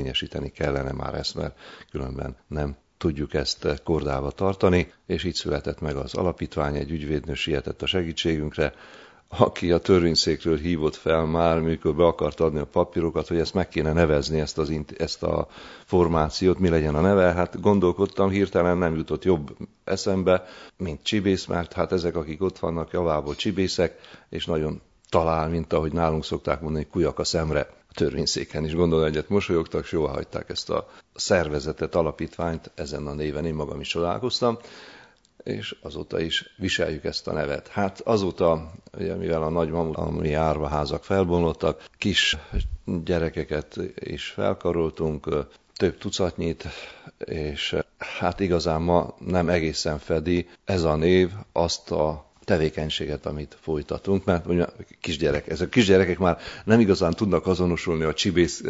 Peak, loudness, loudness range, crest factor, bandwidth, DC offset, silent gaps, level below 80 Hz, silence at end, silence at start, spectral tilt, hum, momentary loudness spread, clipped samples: 0 dBFS; -25 LUFS; 6 LU; 24 dB; 8 kHz; under 0.1%; none; -40 dBFS; 0 s; 0 s; -5.5 dB/octave; none; 11 LU; under 0.1%